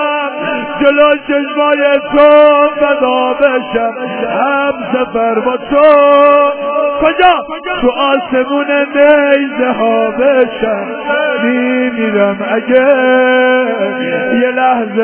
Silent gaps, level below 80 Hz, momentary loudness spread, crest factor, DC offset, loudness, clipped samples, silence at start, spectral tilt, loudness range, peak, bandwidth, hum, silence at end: none; -46 dBFS; 9 LU; 10 dB; under 0.1%; -10 LUFS; 0.3%; 0 s; -8.5 dB/octave; 2 LU; 0 dBFS; 4 kHz; none; 0 s